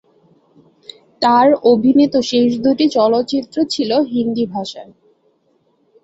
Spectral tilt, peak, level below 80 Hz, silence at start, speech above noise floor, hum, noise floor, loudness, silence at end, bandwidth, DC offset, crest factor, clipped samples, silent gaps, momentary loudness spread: -5.5 dB/octave; -2 dBFS; -58 dBFS; 1.2 s; 46 dB; none; -60 dBFS; -15 LUFS; 1.2 s; 8 kHz; under 0.1%; 14 dB; under 0.1%; none; 9 LU